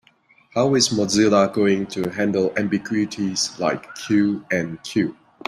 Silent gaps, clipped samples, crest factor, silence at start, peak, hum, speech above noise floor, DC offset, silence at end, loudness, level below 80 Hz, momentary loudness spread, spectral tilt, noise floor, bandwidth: none; under 0.1%; 16 dB; 0.55 s; -4 dBFS; none; 37 dB; under 0.1%; 0.35 s; -21 LUFS; -58 dBFS; 8 LU; -4.5 dB/octave; -57 dBFS; 13 kHz